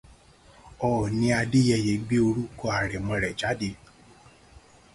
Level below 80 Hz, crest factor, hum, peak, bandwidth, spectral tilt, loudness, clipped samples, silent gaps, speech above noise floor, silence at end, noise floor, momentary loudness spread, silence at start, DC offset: -48 dBFS; 18 dB; none; -10 dBFS; 11.5 kHz; -6 dB/octave; -26 LUFS; under 0.1%; none; 29 dB; 1.2 s; -54 dBFS; 8 LU; 0.65 s; under 0.1%